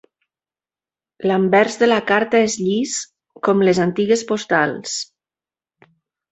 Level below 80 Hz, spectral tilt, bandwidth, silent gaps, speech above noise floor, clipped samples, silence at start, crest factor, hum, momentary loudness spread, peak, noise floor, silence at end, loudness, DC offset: -62 dBFS; -4.5 dB/octave; 8.2 kHz; none; over 73 dB; under 0.1%; 1.2 s; 18 dB; none; 11 LU; 0 dBFS; under -90 dBFS; 1.3 s; -18 LUFS; under 0.1%